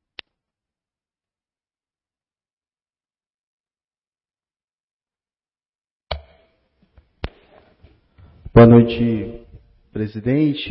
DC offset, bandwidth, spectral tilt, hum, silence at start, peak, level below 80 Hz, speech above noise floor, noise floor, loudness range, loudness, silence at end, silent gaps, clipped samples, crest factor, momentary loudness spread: under 0.1%; 5.6 kHz; -12.5 dB/octave; none; 6.1 s; 0 dBFS; -42 dBFS; over 76 dB; under -90 dBFS; 24 LU; -15 LUFS; 0 s; none; under 0.1%; 22 dB; 25 LU